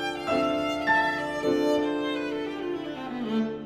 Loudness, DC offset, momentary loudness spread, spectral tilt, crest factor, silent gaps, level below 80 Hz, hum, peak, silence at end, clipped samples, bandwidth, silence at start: -27 LUFS; under 0.1%; 9 LU; -5 dB/octave; 16 dB; none; -58 dBFS; none; -12 dBFS; 0 s; under 0.1%; 15 kHz; 0 s